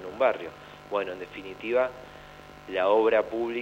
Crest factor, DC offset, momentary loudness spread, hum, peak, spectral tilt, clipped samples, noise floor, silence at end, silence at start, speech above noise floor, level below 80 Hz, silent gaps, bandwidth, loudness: 18 dB; under 0.1%; 23 LU; none; -10 dBFS; -5.5 dB/octave; under 0.1%; -47 dBFS; 0 s; 0 s; 20 dB; -60 dBFS; none; 16 kHz; -27 LUFS